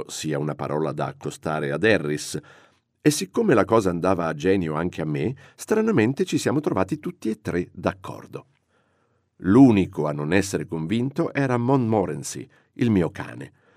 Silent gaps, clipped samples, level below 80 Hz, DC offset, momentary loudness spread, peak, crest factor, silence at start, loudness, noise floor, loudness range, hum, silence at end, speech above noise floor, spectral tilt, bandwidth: none; under 0.1%; -60 dBFS; under 0.1%; 13 LU; -4 dBFS; 18 dB; 0 s; -23 LUFS; -67 dBFS; 4 LU; none; 0.3 s; 45 dB; -6 dB/octave; 15.5 kHz